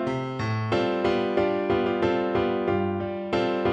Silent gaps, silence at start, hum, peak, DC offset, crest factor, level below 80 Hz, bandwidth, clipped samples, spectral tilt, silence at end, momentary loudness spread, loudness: none; 0 s; none; -10 dBFS; under 0.1%; 16 dB; -52 dBFS; 8 kHz; under 0.1%; -7.5 dB/octave; 0 s; 4 LU; -25 LUFS